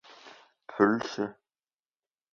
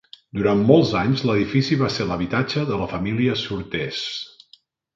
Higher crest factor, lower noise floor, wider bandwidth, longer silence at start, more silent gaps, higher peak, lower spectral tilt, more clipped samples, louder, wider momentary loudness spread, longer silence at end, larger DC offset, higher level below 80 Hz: about the same, 24 dB vs 20 dB; first, under -90 dBFS vs -56 dBFS; about the same, 7.2 kHz vs 7.6 kHz; about the same, 0.25 s vs 0.35 s; neither; second, -8 dBFS vs 0 dBFS; about the same, -6 dB/octave vs -6.5 dB/octave; neither; second, -28 LUFS vs -21 LUFS; first, 19 LU vs 11 LU; first, 1 s vs 0.7 s; neither; second, -74 dBFS vs -48 dBFS